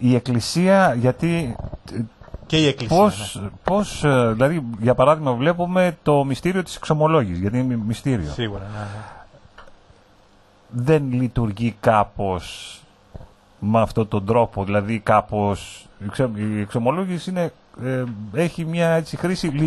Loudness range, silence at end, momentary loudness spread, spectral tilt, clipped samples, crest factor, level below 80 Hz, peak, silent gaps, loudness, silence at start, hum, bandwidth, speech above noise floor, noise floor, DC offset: 6 LU; 0 s; 14 LU; -6.5 dB/octave; under 0.1%; 18 dB; -44 dBFS; -2 dBFS; none; -21 LUFS; 0 s; none; 12.5 kHz; 33 dB; -53 dBFS; under 0.1%